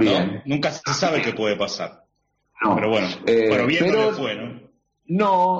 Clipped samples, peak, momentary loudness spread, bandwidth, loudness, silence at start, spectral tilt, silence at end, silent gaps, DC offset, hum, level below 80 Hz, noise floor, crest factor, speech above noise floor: under 0.1%; -8 dBFS; 9 LU; 7.8 kHz; -21 LUFS; 0 s; -3.5 dB/octave; 0 s; none; under 0.1%; none; -58 dBFS; -71 dBFS; 14 dB; 50 dB